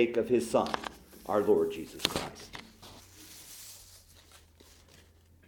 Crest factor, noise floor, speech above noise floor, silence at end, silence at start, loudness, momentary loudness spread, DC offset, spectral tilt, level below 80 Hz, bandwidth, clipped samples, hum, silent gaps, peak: 30 dB; -60 dBFS; 30 dB; 1.1 s; 0 s; -31 LUFS; 23 LU; under 0.1%; -4 dB/octave; -60 dBFS; 18 kHz; under 0.1%; none; none; -4 dBFS